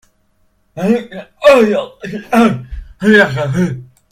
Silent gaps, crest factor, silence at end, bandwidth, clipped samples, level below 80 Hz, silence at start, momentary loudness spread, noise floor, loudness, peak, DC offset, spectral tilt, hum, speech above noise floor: none; 14 dB; 0.3 s; 15.5 kHz; 0.2%; -38 dBFS; 0.75 s; 19 LU; -57 dBFS; -13 LUFS; 0 dBFS; under 0.1%; -6.5 dB/octave; none; 44 dB